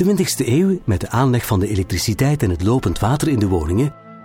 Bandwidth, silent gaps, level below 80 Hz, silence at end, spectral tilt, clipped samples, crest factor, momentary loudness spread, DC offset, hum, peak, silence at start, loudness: 18 kHz; none; -34 dBFS; 0 s; -6 dB/octave; under 0.1%; 14 dB; 3 LU; under 0.1%; none; -4 dBFS; 0 s; -18 LUFS